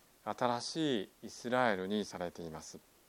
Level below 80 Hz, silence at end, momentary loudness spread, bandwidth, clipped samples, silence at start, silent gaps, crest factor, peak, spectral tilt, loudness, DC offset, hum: -72 dBFS; 0.3 s; 14 LU; 17 kHz; under 0.1%; 0.25 s; none; 22 dB; -16 dBFS; -4.5 dB/octave; -36 LUFS; under 0.1%; none